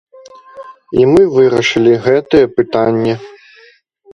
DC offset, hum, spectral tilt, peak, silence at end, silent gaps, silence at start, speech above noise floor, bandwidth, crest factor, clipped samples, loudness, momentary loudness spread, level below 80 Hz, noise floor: under 0.1%; none; -6 dB/octave; 0 dBFS; 0.85 s; none; 0.55 s; 36 dB; 7.6 kHz; 12 dB; under 0.1%; -11 LUFS; 8 LU; -46 dBFS; -46 dBFS